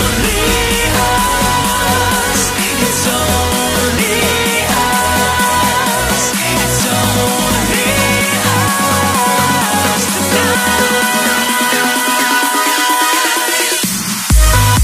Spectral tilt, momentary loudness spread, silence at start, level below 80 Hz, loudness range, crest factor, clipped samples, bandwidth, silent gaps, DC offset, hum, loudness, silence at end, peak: -3 dB/octave; 2 LU; 0 s; -24 dBFS; 1 LU; 12 dB; under 0.1%; 15.5 kHz; none; under 0.1%; none; -12 LUFS; 0 s; 0 dBFS